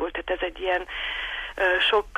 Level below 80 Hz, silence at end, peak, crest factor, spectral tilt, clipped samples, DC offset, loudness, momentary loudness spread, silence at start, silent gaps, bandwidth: -46 dBFS; 0 s; -10 dBFS; 16 dB; -3.5 dB/octave; under 0.1%; under 0.1%; -25 LUFS; 9 LU; 0 s; none; 13.5 kHz